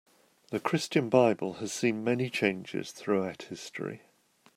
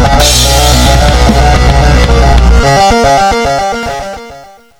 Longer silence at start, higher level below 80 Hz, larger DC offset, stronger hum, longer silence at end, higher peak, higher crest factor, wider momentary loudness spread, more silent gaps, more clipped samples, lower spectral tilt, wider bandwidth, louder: first, 0.5 s vs 0 s; second, -74 dBFS vs -10 dBFS; neither; neither; first, 0.6 s vs 0.35 s; second, -10 dBFS vs 0 dBFS; first, 22 dB vs 6 dB; first, 15 LU vs 10 LU; neither; second, under 0.1% vs 1%; about the same, -5 dB/octave vs -4 dB/octave; about the same, 16 kHz vs 17 kHz; second, -30 LUFS vs -7 LUFS